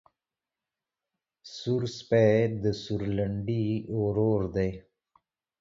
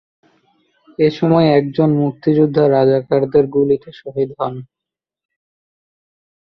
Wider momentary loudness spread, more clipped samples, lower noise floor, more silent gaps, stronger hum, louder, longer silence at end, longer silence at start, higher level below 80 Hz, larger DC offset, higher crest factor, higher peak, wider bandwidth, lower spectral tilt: second, 9 LU vs 12 LU; neither; first, under -90 dBFS vs -85 dBFS; neither; neither; second, -28 LUFS vs -15 LUFS; second, 0.8 s vs 1.85 s; first, 1.45 s vs 1 s; about the same, -52 dBFS vs -56 dBFS; neither; about the same, 20 dB vs 16 dB; second, -10 dBFS vs -2 dBFS; first, 7.6 kHz vs 6 kHz; second, -7.5 dB/octave vs -9.5 dB/octave